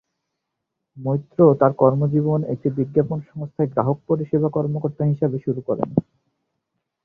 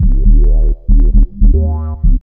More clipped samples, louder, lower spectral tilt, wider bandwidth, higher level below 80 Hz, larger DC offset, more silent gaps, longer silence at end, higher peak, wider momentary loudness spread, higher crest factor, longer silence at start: second, under 0.1% vs 0.3%; second, -21 LUFS vs -14 LUFS; second, -13 dB/octave vs -15 dB/octave; first, 2.6 kHz vs 1.3 kHz; second, -58 dBFS vs -8 dBFS; neither; neither; first, 1.05 s vs 0.15 s; about the same, -2 dBFS vs 0 dBFS; first, 9 LU vs 5 LU; first, 20 dB vs 8 dB; first, 0.95 s vs 0 s